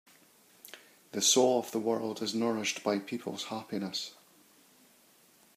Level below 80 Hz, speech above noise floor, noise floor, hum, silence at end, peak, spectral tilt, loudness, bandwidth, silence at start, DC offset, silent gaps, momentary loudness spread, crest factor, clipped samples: -84 dBFS; 32 dB; -63 dBFS; none; 1.45 s; -10 dBFS; -2.5 dB/octave; -31 LUFS; 15.5 kHz; 0.65 s; under 0.1%; none; 21 LU; 24 dB; under 0.1%